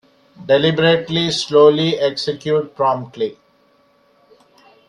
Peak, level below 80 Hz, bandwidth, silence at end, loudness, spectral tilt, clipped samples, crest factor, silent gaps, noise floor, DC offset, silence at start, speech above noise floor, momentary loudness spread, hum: 0 dBFS; -58 dBFS; 10.5 kHz; 1.55 s; -16 LUFS; -5 dB/octave; under 0.1%; 18 dB; none; -56 dBFS; under 0.1%; 0.4 s; 40 dB; 13 LU; none